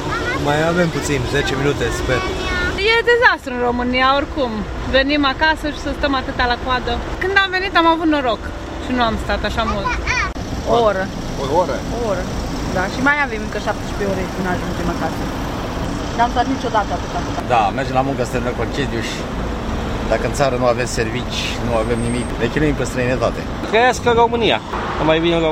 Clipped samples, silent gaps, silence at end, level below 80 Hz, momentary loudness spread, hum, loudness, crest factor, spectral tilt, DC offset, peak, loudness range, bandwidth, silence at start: under 0.1%; none; 0 s; -30 dBFS; 8 LU; none; -18 LUFS; 18 dB; -5 dB/octave; under 0.1%; 0 dBFS; 4 LU; 16 kHz; 0 s